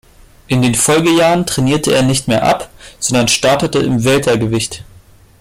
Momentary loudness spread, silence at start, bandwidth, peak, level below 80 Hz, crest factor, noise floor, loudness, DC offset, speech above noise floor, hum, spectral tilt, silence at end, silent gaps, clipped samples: 8 LU; 0.5 s; 16.5 kHz; 0 dBFS; -40 dBFS; 12 dB; -43 dBFS; -13 LUFS; under 0.1%; 30 dB; none; -4 dB/octave; 0.6 s; none; under 0.1%